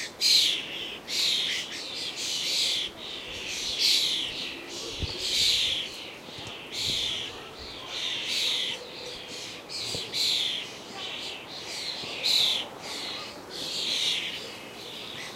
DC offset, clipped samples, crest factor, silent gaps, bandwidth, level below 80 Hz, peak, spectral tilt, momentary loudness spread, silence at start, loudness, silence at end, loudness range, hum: under 0.1%; under 0.1%; 22 dB; none; 16 kHz; -56 dBFS; -8 dBFS; -0.5 dB/octave; 16 LU; 0 s; -27 LUFS; 0 s; 4 LU; none